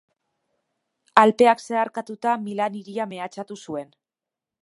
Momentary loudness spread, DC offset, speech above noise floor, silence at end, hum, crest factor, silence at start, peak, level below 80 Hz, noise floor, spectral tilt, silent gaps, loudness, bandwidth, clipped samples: 17 LU; under 0.1%; 66 dB; 0.8 s; none; 24 dB; 1.15 s; 0 dBFS; -70 dBFS; -89 dBFS; -5 dB/octave; none; -22 LUFS; 11.5 kHz; under 0.1%